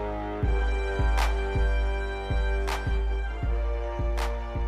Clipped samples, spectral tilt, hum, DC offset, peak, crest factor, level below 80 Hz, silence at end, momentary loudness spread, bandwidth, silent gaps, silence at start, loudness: under 0.1%; -6 dB/octave; none; under 0.1%; -14 dBFS; 12 dB; -28 dBFS; 0 s; 4 LU; 10.5 kHz; none; 0 s; -29 LUFS